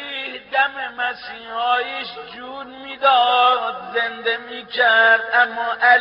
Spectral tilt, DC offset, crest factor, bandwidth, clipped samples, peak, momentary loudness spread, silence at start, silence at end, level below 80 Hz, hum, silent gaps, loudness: 3.5 dB/octave; under 0.1%; 18 dB; 5.6 kHz; under 0.1%; -2 dBFS; 18 LU; 0 s; 0 s; -66 dBFS; none; none; -18 LUFS